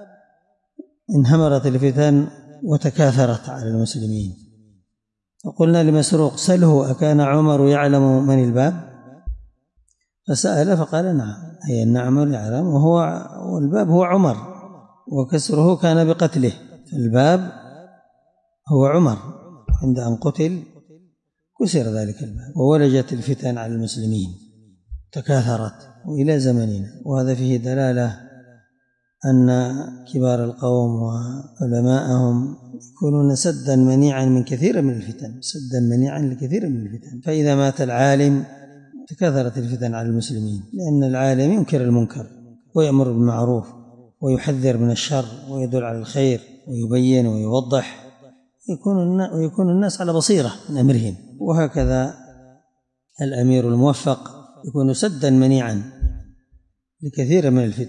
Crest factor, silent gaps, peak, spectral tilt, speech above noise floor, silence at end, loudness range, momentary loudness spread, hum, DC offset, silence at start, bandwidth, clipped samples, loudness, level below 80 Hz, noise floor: 14 dB; none; -6 dBFS; -7 dB/octave; 61 dB; 0 s; 4 LU; 14 LU; none; under 0.1%; 0 s; 11 kHz; under 0.1%; -19 LUFS; -40 dBFS; -78 dBFS